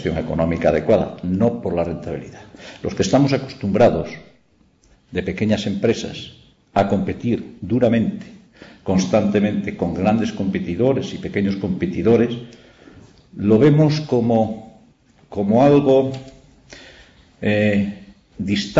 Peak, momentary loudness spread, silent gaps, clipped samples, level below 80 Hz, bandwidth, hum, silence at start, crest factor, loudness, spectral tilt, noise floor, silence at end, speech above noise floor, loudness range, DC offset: -4 dBFS; 16 LU; none; under 0.1%; -46 dBFS; 7.8 kHz; none; 0 s; 16 dB; -19 LUFS; -7 dB/octave; -57 dBFS; 0 s; 39 dB; 4 LU; under 0.1%